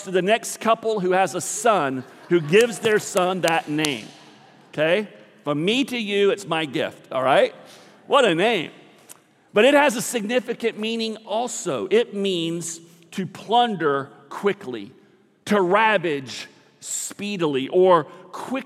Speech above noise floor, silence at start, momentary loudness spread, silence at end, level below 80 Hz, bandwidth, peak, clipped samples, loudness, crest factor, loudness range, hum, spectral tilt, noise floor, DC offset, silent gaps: 29 dB; 0 s; 16 LU; 0 s; -76 dBFS; 16 kHz; -4 dBFS; under 0.1%; -21 LUFS; 18 dB; 3 LU; none; -4 dB/octave; -50 dBFS; under 0.1%; none